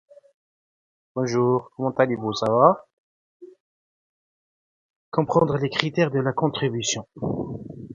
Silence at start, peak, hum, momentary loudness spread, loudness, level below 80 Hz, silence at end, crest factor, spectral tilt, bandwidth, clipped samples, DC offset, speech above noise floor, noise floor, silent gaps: 1.15 s; 0 dBFS; none; 12 LU; -23 LUFS; -58 dBFS; 0 s; 24 dB; -5.5 dB/octave; 9.6 kHz; under 0.1%; under 0.1%; over 68 dB; under -90 dBFS; 2.93-3.40 s, 3.60-5.12 s